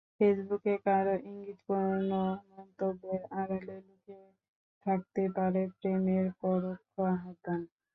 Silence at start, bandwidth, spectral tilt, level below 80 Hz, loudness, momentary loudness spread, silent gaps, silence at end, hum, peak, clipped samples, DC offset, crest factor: 0.2 s; 4.1 kHz; -11 dB/octave; -70 dBFS; -33 LUFS; 10 LU; 4.48-4.81 s; 0.3 s; none; -14 dBFS; under 0.1%; under 0.1%; 18 dB